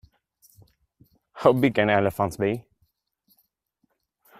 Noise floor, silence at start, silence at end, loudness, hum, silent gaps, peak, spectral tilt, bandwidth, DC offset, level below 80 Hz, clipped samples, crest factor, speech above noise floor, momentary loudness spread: -74 dBFS; 1.35 s; 1.8 s; -23 LUFS; none; none; -4 dBFS; -6.5 dB/octave; 15.5 kHz; under 0.1%; -60 dBFS; under 0.1%; 24 dB; 52 dB; 8 LU